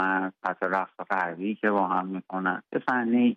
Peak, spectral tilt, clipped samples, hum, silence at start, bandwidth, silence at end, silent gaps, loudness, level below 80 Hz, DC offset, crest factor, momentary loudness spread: -10 dBFS; -8 dB/octave; under 0.1%; none; 0 s; 5.4 kHz; 0 s; none; -28 LUFS; -78 dBFS; under 0.1%; 16 dB; 6 LU